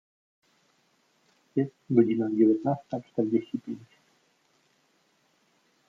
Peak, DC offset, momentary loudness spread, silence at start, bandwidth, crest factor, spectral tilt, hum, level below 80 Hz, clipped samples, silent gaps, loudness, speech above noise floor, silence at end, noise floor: -8 dBFS; under 0.1%; 13 LU; 1.55 s; 6 kHz; 22 dB; -10 dB/octave; none; -78 dBFS; under 0.1%; none; -27 LUFS; 43 dB; 2.05 s; -69 dBFS